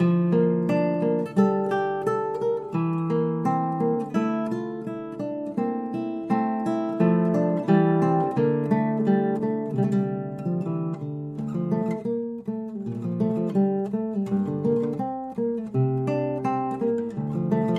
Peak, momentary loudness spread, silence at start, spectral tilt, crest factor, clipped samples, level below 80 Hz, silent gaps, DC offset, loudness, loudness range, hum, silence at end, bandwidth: -8 dBFS; 9 LU; 0 s; -9.5 dB/octave; 18 dB; under 0.1%; -64 dBFS; none; under 0.1%; -25 LUFS; 5 LU; none; 0 s; 8 kHz